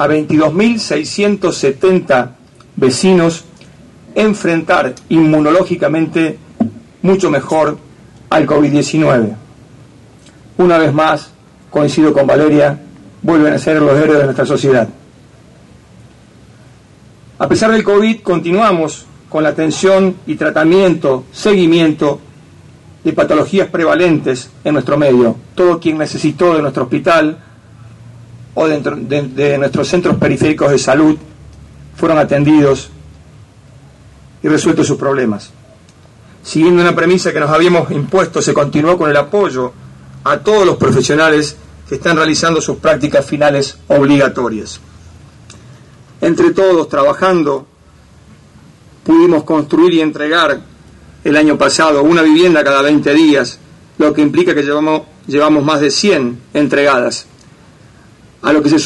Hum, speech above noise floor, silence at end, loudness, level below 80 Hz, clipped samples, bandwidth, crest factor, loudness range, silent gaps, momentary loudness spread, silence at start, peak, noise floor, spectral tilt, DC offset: none; 32 dB; 0 s; -12 LUFS; -46 dBFS; under 0.1%; 11.5 kHz; 10 dB; 4 LU; none; 10 LU; 0 s; -2 dBFS; -43 dBFS; -5.5 dB/octave; under 0.1%